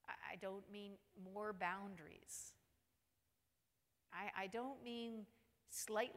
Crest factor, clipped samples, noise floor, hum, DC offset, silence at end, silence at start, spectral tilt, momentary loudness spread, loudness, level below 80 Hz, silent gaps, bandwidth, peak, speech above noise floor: 22 dB; under 0.1%; -88 dBFS; none; under 0.1%; 0 s; 0.05 s; -3 dB/octave; 13 LU; -50 LUFS; -84 dBFS; none; 16 kHz; -28 dBFS; 39 dB